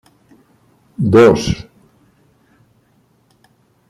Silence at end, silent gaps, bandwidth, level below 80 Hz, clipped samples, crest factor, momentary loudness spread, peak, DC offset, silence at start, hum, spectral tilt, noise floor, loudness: 2.25 s; none; 12 kHz; -42 dBFS; under 0.1%; 18 dB; 17 LU; -2 dBFS; under 0.1%; 1 s; none; -6.5 dB/octave; -57 dBFS; -13 LUFS